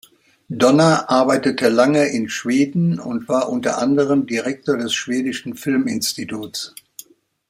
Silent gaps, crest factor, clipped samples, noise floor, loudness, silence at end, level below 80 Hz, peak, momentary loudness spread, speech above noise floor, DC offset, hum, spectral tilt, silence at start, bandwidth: none; 18 dB; under 0.1%; -43 dBFS; -18 LUFS; 0.8 s; -62 dBFS; -2 dBFS; 12 LU; 26 dB; under 0.1%; none; -5 dB/octave; 0.5 s; 16 kHz